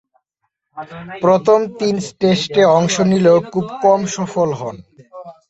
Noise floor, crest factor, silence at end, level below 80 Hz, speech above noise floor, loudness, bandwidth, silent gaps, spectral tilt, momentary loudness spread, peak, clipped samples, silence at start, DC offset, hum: -73 dBFS; 14 dB; 0.2 s; -56 dBFS; 58 dB; -15 LUFS; 8.2 kHz; none; -5.5 dB/octave; 17 LU; -2 dBFS; under 0.1%; 0.75 s; under 0.1%; none